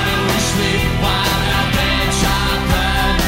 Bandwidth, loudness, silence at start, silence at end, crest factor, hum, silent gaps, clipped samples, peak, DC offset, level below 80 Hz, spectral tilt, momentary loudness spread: 16.5 kHz; -16 LUFS; 0 s; 0 s; 14 dB; none; none; under 0.1%; -2 dBFS; under 0.1%; -22 dBFS; -4 dB/octave; 1 LU